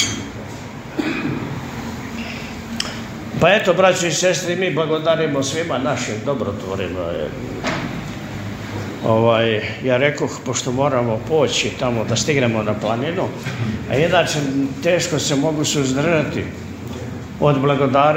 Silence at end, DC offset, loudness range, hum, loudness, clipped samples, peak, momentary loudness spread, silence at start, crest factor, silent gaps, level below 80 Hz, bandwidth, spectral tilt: 0 s; under 0.1%; 5 LU; none; -19 LUFS; under 0.1%; 0 dBFS; 13 LU; 0 s; 18 dB; none; -46 dBFS; 16 kHz; -4.5 dB/octave